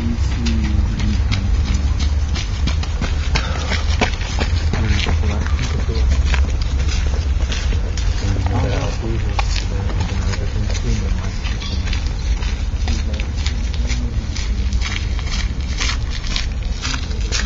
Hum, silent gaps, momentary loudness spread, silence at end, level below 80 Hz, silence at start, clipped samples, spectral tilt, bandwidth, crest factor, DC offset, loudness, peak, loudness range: none; none; 4 LU; 0 s; -20 dBFS; 0 s; under 0.1%; -5 dB/octave; 7.8 kHz; 18 dB; under 0.1%; -21 LUFS; 0 dBFS; 3 LU